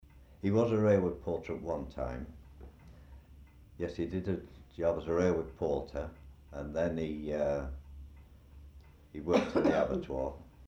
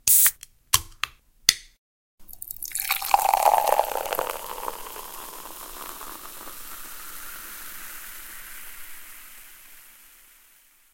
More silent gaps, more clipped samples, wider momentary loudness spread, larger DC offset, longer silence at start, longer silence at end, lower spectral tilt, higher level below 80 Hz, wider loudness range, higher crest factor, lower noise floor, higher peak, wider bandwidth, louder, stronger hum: second, none vs 1.78-2.18 s; neither; about the same, 21 LU vs 21 LU; neither; about the same, 0.15 s vs 0.05 s; second, 0 s vs 0.85 s; first, -7.5 dB/octave vs 0.5 dB/octave; about the same, -50 dBFS vs -52 dBFS; second, 6 LU vs 15 LU; second, 20 dB vs 28 dB; about the same, -56 dBFS vs -57 dBFS; second, -16 dBFS vs 0 dBFS; second, 9.4 kHz vs 17 kHz; second, -33 LUFS vs -24 LUFS; neither